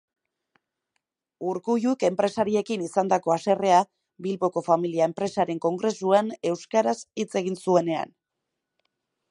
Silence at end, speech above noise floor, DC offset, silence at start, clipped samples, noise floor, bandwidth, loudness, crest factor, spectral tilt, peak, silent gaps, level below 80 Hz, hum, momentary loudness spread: 1.25 s; 59 dB; under 0.1%; 1.4 s; under 0.1%; -83 dBFS; 11.5 kHz; -25 LUFS; 18 dB; -5.5 dB/octave; -6 dBFS; none; -72 dBFS; none; 8 LU